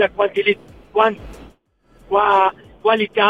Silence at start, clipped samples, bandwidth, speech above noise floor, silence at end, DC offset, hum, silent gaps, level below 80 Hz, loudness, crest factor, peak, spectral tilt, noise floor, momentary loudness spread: 0 s; under 0.1%; 8.6 kHz; 38 dB; 0 s; under 0.1%; none; none; -48 dBFS; -18 LUFS; 16 dB; -2 dBFS; -5.5 dB/octave; -54 dBFS; 8 LU